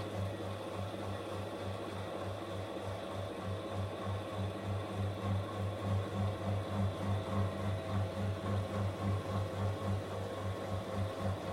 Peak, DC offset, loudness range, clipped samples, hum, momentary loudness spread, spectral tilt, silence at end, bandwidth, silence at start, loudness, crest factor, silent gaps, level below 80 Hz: -22 dBFS; under 0.1%; 4 LU; under 0.1%; none; 5 LU; -7 dB/octave; 0 s; 13.5 kHz; 0 s; -39 LUFS; 16 dB; none; -60 dBFS